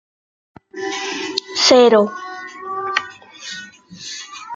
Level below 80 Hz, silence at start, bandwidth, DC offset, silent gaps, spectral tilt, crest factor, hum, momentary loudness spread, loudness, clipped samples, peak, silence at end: -68 dBFS; 0.75 s; 9.2 kHz; under 0.1%; none; -2.5 dB/octave; 18 dB; none; 23 LU; -16 LUFS; under 0.1%; -2 dBFS; 0 s